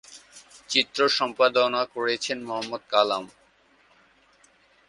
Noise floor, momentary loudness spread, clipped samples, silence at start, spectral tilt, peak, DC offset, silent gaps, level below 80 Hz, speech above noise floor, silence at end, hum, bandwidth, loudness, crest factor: -61 dBFS; 10 LU; under 0.1%; 0.1 s; -2 dB/octave; -4 dBFS; under 0.1%; none; -70 dBFS; 36 dB; 1.6 s; none; 11.5 kHz; -24 LUFS; 24 dB